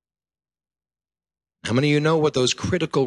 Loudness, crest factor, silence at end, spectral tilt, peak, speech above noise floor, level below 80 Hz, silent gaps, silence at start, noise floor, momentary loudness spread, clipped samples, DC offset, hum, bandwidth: -21 LUFS; 16 dB; 0 s; -5 dB/octave; -8 dBFS; over 70 dB; -50 dBFS; none; 1.65 s; under -90 dBFS; 6 LU; under 0.1%; under 0.1%; none; 11.5 kHz